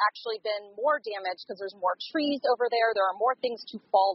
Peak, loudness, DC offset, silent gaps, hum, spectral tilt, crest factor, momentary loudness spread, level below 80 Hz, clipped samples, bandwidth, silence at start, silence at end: -12 dBFS; -28 LUFS; under 0.1%; none; none; 0.5 dB/octave; 16 dB; 9 LU; -82 dBFS; under 0.1%; 5.8 kHz; 0 s; 0 s